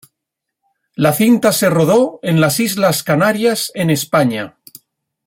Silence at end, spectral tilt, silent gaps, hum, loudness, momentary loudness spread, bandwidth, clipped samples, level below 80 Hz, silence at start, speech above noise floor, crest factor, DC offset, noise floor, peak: 0.8 s; -5 dB/octave; none; none; -14 LUFS; 6 LU; 16.5 kHz; under 0.1%; -56 dBFS; 1 s; 65 dB; 14 dB; under 0.1%; -79 dBFS; -2 dBFS